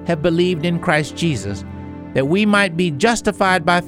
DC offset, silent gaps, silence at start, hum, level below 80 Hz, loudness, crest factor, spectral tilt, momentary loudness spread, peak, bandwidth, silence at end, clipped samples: under 0.1%; none; 0 s; none; -44 dBFS; -17 LUFS; 16 dB; -5.5 dB/octave; 12 LU; -2 dBFS; 13.5 kHz; 0 s; under 0.1%